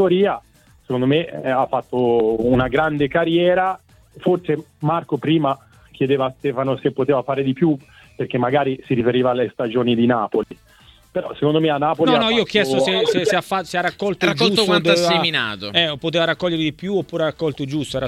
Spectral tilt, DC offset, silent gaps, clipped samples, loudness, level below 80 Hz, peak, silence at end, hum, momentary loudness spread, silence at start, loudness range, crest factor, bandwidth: -5.5 dB/octave; under 0.1%; none; under 0.1%; -19 LUFS; -50 dBFS; -2 dBFS; 0 s; none; 8 LU; 0 s; 3 LU; 18 dB; 14.5 kHz